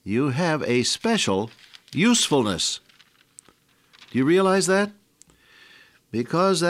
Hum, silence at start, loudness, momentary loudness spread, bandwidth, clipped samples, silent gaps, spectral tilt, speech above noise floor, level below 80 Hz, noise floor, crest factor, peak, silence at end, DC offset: none; 0.05 s; -22 LUFS; 11 LU; 16 kHz; under 0.1%; none; -4 dB/octave; 38 dB; -62 dBFS; -59 dBFS; 16 dB; -8 dBFS; 0 s; under 0.1%